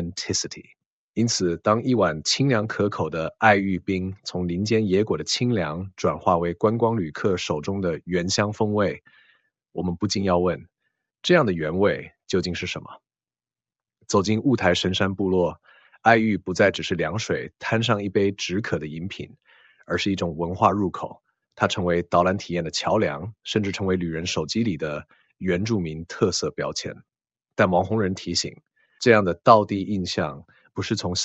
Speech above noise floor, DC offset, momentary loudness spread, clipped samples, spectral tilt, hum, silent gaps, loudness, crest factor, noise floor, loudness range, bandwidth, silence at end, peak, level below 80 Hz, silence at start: over 67 dB; under 0.1%; 12 LU; under 0.1%; -5 dB/octave; none; 0.86-1.14 s; -23 LUFS; 24 dB; under -90 dBFS; 4 LU; 8.2 kHz; 0 s; 0 dBFS; -58 dBFS; 0 s